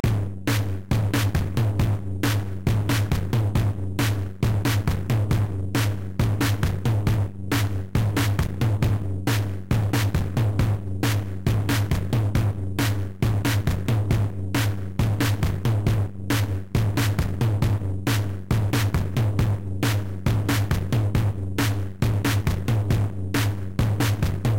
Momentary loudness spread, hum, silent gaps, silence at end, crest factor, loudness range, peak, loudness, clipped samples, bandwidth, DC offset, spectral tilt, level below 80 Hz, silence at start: 3 LU; none; none; 0 s; 14 dB; 0 LU; -10 dBFS; -24 LUFS; under 0.1%; 17 kHz; 1%; -6 dB/octave; -34 dBFS; 0.05 s